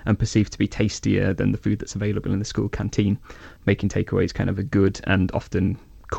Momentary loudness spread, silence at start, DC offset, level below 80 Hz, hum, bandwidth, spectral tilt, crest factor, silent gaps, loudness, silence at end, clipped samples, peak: 5 LU; 0 s; under 0.1%; -40 dBFS; none; 8.4 kHz; -6.5 dB/octave; 16 dB; none; -23 LUFS; 0 s; under 0.1%; -6 dBFS